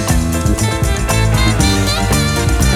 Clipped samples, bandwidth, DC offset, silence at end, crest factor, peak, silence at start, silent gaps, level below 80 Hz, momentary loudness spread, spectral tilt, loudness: under 0.1%; 17 kHz; under 0.1%; 0 s; 12 dB; 0 dBFS; 0 s; none; -18 dBFS; 3 LU; -4.5 dB/octave; -14 LUFS